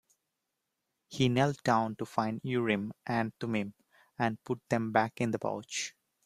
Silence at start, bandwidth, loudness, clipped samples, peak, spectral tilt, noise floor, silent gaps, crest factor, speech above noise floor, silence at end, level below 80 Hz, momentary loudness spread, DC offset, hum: 1.1 s; 14 kHz; -32 LUFS; under 0.1%; -10 dBFS; -5.5 dB/octave; -85 dBFS; none; 22 dB; 53 dB; 0.35 s; -66 dBFS; 8 LU; under 0.1%; none